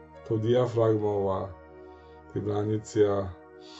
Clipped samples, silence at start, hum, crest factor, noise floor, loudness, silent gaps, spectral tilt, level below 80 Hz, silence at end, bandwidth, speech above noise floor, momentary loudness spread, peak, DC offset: under 0.1%; 0 s; none; 16 dB; -49 dBFS; -28 LUFS; none; -7.5 dB/octave; -58 dBFS; 0 s; 8.2 kHz; 22 dB; 15 LU; -12 dBFS; under 0.1%